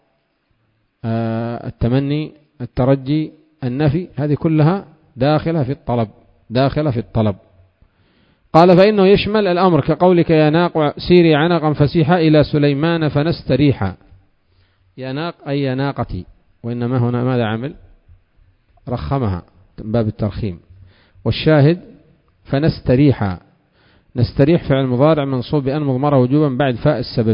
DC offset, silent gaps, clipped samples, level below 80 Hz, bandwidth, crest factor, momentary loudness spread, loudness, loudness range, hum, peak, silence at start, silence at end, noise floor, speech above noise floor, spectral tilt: under 0.1%; none; under 0.1%; -38 dBFS; 5.4 kHz; 16 dB; 14 LU; -16 LUFS; 9 LU; none; 0 dBFS; 1.05 s; 0 s; -64 dBFS; 49 dB; -10 dB/octave